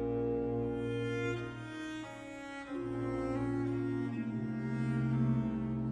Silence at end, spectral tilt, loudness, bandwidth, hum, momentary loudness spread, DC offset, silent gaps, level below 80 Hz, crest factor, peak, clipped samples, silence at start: 0 s; -8 dB/octave; -36 LUFS; 10.5 kHz; none; 10 LU; under 0.1%; none; -56 dBFS; 14 dB; -22 dBFS; under 0.1%; 0 s